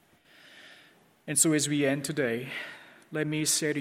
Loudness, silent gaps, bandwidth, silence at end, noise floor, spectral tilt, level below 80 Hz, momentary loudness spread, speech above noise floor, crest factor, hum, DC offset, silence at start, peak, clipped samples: -28 LUFS; none; 16.5 kHz; 0 s; -59 dBFS; -3 dB/octave; -74 dBFS; 17 LU; 31 dB; 22 dB; none; under 0.1%; 0.55 s; -8 dBFS; under 0.1%